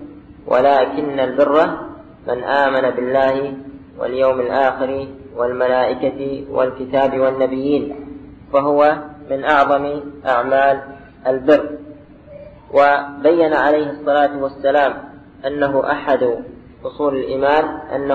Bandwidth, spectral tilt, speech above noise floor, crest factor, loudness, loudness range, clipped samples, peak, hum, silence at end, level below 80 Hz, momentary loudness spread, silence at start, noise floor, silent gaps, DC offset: 6.6 kHz; -7 dB/octave; 23 dB; 16 dB; -17 LUFS; 2 LU; under 0.1%; -2 dBFS; none; 0 s; -50 dBFS; 14 LU; 0 s; -39 dBFS; none; under 0.1%